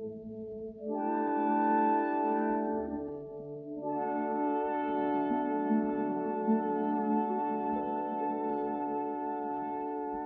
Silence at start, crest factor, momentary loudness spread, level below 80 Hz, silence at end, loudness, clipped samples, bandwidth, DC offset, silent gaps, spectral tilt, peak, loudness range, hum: 0 s; 14 dB; 12 LU; -68 dBFS; 0 s; -32 LUFS; under 0.1%; 3.7 kHz; under 0.1%; none; -7 dB/octave; -18 dBFS; 2 LU; none